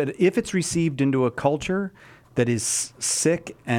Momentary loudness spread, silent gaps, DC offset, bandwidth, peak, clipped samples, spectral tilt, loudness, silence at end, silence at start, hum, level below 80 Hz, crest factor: 7 LU; none; under 0.1%; 18.5 kHz; -6 dBFS; under 0.1%; -4.5 dB/octave; -23 LUFS; 0 s; 0 s; none; -54 dBFS; 18 dB